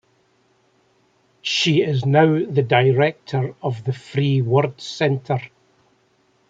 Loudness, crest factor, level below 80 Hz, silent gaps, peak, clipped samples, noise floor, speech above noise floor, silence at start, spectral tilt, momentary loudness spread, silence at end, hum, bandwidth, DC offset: -20 LUFS; 20 dB; -62 dBFS; none; -2 dBFS; under 0.1%; -62 dBFS; 43 dB; 1.45 s; -6 dB/octave; 10 LU; 1.05 s; none; 7.8 kHz; under 0.1%